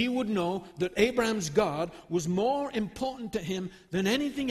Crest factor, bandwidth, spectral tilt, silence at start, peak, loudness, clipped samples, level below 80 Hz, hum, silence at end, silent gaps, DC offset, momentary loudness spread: 18 dB; 13.5 kHz; -5 dB/octave; 0 s; -10 dBFS; -30 LUFS; under 0.1%; -56 dBFS; none; 0 s; none; under 0.1%; 9 LU